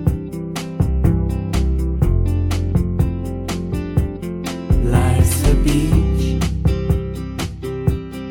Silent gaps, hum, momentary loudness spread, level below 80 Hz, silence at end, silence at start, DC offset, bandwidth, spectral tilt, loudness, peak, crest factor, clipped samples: none; none; 10 LU; -22 dBFS; 0 s; 0 s; under 0.1%; 17 kHz; -6.5 dB/octave; -19 LUFS; -2 dBFS; 14 dB; under 0.1%